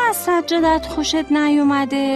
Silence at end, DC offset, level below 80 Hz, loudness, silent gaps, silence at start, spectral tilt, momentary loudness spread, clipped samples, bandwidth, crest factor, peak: 0 s; under 0.1%; -42 dBFS; -17 LUFS; none; 0 s; -3.5 dB/octave; 4 LU; under 0.1%; 13.5 kHz; 10 dB; -6 dBFS